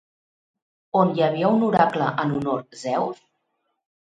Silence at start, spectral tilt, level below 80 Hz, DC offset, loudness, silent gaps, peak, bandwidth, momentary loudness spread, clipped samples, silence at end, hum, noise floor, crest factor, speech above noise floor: 0.95 s; -7 dB/octave; -62 dBFS; under 0.1%; -22 LUFS; none; -4 dBFS; 9.2 kHz; 9 LU; under 0.1%; 1 s; none; -75 dBFS; 20 dB; 53 dB